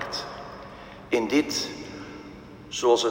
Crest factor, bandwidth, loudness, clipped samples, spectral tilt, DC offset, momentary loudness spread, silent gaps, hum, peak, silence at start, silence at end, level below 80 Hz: 20 dB; 16 kHz; -26 LUFS; under 0.1%; -3 dB/octave; under 0.1%; 20 LU; none; none; -8 dBFS; 0 s; 0 s; -56 dBFS